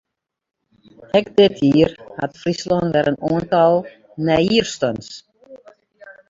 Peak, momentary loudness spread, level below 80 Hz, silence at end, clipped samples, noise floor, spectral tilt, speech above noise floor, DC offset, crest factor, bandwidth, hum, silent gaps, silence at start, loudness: -2 dBFS; 14 LU; -50 dBFS; 0.2 s; under 0.1%; -47 dBFS; -6 dB/octave; 30 dB; under 0.1%; 18 dB; 7.8 kHz; none; none; 1.15 s; -18 LUFS